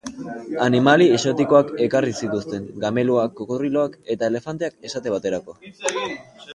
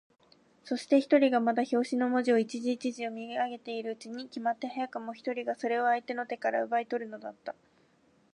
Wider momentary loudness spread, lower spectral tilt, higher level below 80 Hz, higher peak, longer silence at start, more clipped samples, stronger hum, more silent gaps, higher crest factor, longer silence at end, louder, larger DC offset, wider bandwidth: about the same, 14 LU vs 15 LU; about the same, -5.5 dB/octave vs -4.5 dB/octave; first, -60 dBFS vs -84 dBFS; first, 0 dBFS vs -12 dBFS; second, 0.05 s vs 0.65 s; neither; neither; neither; about the same, 20 dB vs 20 dB; second, 0 s vs 0.85 s; first, -21 LUFS vs -31 LUFS; neither; about the same, 11.5 kHz vs 10.5 kHz